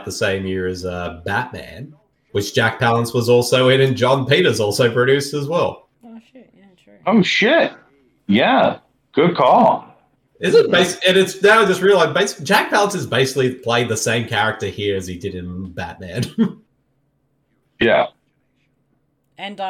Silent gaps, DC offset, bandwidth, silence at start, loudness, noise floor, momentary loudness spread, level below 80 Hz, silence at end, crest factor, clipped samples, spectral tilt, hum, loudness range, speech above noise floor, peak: none; under 0.1%; 16.5 kHz; 0 s; -17 LUFS; -65 dBFS; 15 LU; -56 dBFS; 0 s; 14 dB; under 0.1%; -4.5 dB/octave; none; 8 LU; 49 dB; -4 dBFS